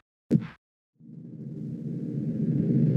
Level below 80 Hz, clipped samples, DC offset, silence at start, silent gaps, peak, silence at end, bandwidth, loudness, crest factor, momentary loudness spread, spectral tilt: -64 dBFS; under 0.1%; under 0.1%; 0.3 s; 0.58-0.93 s; -10 dBFS; 0 s; 5.4 kHz; -29 LUFS; 20 dB; 19 LU; -11 dB/octave